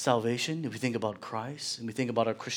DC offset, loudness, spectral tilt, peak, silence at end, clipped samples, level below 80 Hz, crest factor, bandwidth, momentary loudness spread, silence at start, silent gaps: under 0.1%; -32 LUFS; -4.5 dB/octave; -10 dBFS; 0 s; under 0.1%; -76 dBFS; 22 dB; 18.5 kHz; 7 LU; 0 s; none